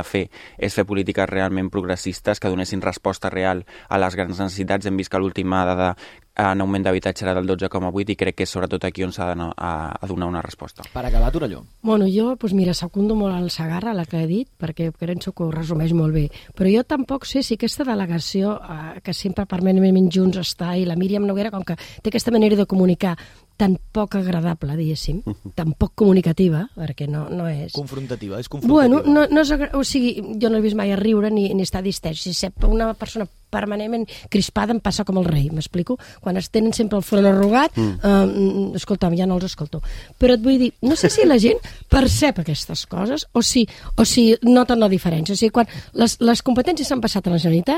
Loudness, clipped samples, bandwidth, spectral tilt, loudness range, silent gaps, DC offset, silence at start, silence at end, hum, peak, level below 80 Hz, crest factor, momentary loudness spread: -20 LUFS; under 0.1%; 16 kHz; -6 dB/octave; 6 LU; none; under 0.1%; 0 s; 0 s; none; -2 dBFS; -32 dBFS; 16 dB; 11 LU